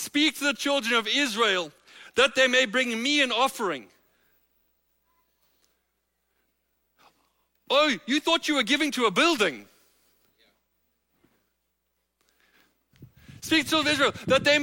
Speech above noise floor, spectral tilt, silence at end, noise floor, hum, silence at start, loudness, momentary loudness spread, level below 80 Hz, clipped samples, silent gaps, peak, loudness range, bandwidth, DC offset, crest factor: 53 dB; -2.5 dB/octave; 0 s; -77 dBFS; none; 0 s; -23 LUFS; 8 LU; -66 dBFS; under 0.1%; none; -8 dBFS; 9 LU; 16.5 kHz; under 0.1%; 20 dB